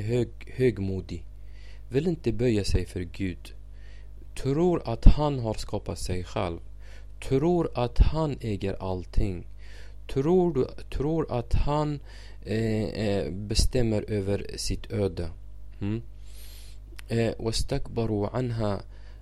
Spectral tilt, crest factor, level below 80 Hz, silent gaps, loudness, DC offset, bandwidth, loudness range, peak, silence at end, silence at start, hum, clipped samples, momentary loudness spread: -6.5 dB/octave; 26 dB; -32 dBFS; none; -28 LUFS; 0.7%; 13 kHz; 4 LU; 0 dBFS; 0 s; 0 s; none; under 0.1%; 22 LU